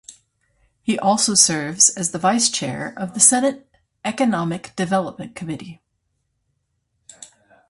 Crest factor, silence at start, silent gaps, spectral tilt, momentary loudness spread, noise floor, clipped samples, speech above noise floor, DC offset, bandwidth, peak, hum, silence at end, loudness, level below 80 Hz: 22 dB; 0.1 s; none; -2.5 dB/octave; 17 LU; -72 dBFS; under 0.1%; 52 dB; under 0.1%; 11.5 kHz; 0 dBFS; none; 0.45 s; -18 LUFS; -62 dBFS